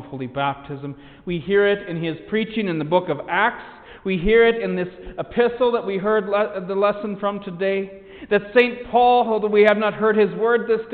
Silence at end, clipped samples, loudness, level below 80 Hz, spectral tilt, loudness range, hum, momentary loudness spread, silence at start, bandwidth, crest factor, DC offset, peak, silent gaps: 0 s; under 0.1%; -20 LUFS; -44 dBFS; -8.5 dB/octave; 4 LU; none; 15 LU; 0 s; 4.6 kHz; 18 dB; under 0.1%; -4 dBFS; none